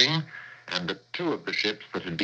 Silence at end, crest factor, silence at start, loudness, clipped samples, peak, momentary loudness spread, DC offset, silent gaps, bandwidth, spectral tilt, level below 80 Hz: 0 s; 26 dB; 0 s; -29 LUFS; under 0.1%; -4 dBFS; 9 LU; under 0.1%; none; 8.4 kHz; -4 dB/octave; -66 dBFS